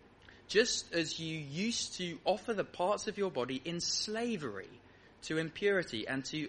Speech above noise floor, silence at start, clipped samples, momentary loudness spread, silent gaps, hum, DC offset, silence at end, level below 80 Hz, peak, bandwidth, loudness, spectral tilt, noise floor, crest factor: 23 dB; 0.25 s; under 0.1%; 7 LU; none; none; under 0.1%; 0 s; -68 dBFS; -14 dBFS; 10.5 kHz; -35 LUFS; -3 dB/octave; -59 dBFS; 22 dB